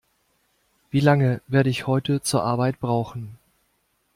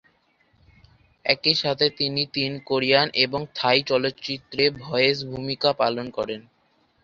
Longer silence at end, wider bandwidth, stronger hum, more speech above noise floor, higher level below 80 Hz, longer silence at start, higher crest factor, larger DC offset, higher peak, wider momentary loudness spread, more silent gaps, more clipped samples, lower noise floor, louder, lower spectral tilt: first, 0.8 s vs 0.65 s; first, 16 kHz vs 7.6 kHz; neither; first, 48 dB vs 41 dB; about the same, -58 dBFS vs -60 dBFS; second, 0.95 s vs 1.25 s; about the same, 18 dB vs 22 dB; neither; about the same, -4 dBFS vs -2 dBFS; about the same, 10 LU vs 10 LU; neither; neither; first, -69 dBFS vs -65 dBFS; about the same, -22 LUFS vs -22 LUFS; about the same, -6 dB/octave vs -5 dB/octave